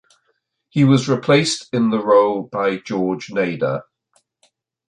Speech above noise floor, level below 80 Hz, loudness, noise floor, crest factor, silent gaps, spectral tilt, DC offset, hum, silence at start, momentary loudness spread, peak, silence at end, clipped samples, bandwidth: 51 dB; -62 dBFS; -18 LUFS; -69 dBFS; 16 dB; none; -6 dB/octave; under 0.1%; none; 0.75 s; 8 LU; -2 dBFS; 1.05 s; under 0.1%; 10.5 kHz